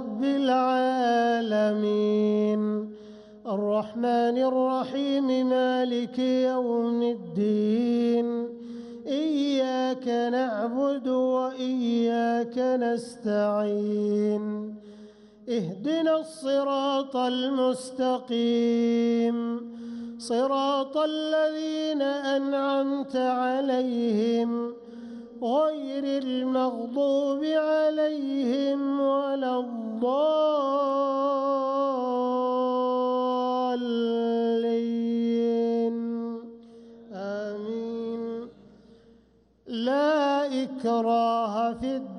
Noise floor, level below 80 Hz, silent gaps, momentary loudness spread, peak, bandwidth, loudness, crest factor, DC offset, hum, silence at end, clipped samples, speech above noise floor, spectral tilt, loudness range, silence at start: -61 dBFS; -70 dBFS; none; 9 LU; -14 dBFS; 11 kHz; -26 LUFS; 12 dB; under 0.1%; none; 0 s; under 0.1%; 36 dB; -6 dB/octave; 3 LU; 0 s